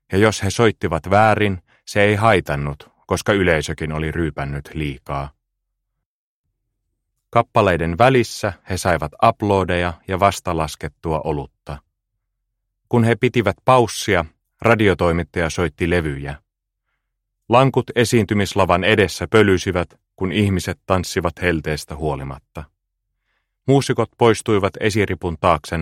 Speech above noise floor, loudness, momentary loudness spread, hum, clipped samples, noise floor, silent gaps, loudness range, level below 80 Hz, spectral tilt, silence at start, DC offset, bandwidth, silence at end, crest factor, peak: 59 dB; -18 LUFS; 13 LU; none; under 0.1%; -77 dBFS; 6.06-6.44 s; 6 LU; -40 dBFS; -5.5 dB/octave; 0.1 s; under 0.1%; 16 kHz; 0 s; 18 dB; 0 dBFS